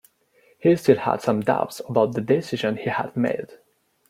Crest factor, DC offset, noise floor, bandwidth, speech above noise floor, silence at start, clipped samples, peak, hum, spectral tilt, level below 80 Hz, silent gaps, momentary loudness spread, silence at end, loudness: 20 dB; under 0.1%; -60 dBFS; 16 kHz; 39 dB; 0.65 s; under 0.1%; -2 dBFS; none; -6.5 dB/octave; -62 dBFS; none; 7 LU; 0.55 s; -22 LUFS